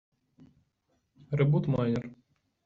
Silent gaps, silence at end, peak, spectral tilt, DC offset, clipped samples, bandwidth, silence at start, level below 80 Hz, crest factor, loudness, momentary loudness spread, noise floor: none; 0.5 s; -14 dBFS; -8.5 dB/octave; under 0.1%; under 0.1%; 6.4 kHz; 1.3 s; -62 dBFS; 18 dB; -29 LUFS; 10 LU; -76 dBFS